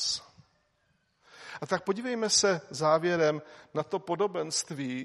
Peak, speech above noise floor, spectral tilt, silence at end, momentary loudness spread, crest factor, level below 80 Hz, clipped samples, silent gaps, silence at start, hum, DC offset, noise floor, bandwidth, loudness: -10 dBFS; 43 dB; -3 dB/octave; 0 s; 13 LU; 20 dB; -74 dBFS; under 0.1%; none; 0 s; none; under 0.1%; -73 dBFS; 13 kHz; -29 LUFS